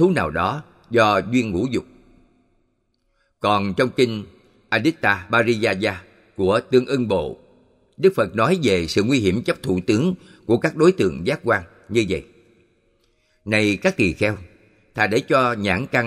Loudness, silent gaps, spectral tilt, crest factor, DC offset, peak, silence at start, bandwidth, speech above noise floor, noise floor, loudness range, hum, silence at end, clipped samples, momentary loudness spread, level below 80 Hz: -20 LUFS; none; -6 dB/octave; 18 dB; under 0.1%; -2 dBFS; 0 s; 13.5 kHz; 48 dB; -68 dBFS; 3 LU; none; 0 s; under 0.1%; 8 LU; -50 dBFS